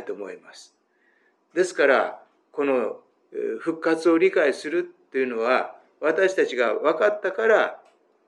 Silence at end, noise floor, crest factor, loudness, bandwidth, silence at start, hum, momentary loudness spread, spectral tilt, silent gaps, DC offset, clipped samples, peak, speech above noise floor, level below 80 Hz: 0.5 s; -65 dBFS; 18 dB; -23 LUFS; 11 kHz; 0 s; none; 15 LU; -4 dB/octave; none; under 0.1%; under 0.1%; -6 dBFS; 42 dB; under -90 dBFS